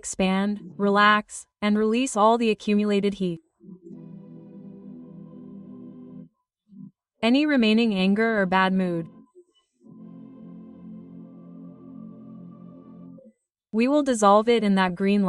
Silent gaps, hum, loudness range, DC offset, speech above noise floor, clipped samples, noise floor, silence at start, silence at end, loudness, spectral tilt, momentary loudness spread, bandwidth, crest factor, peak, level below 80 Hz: none; none; 22 LU; under 0.1%; 36 dB; under 0.1%; -58 dBFS; 0.05 s; 0 s; -22 LUFS; -5.5 dB/octave; 25 LU; 11.5 kHz; 20 dB; -6 dBFS; -62 dBFS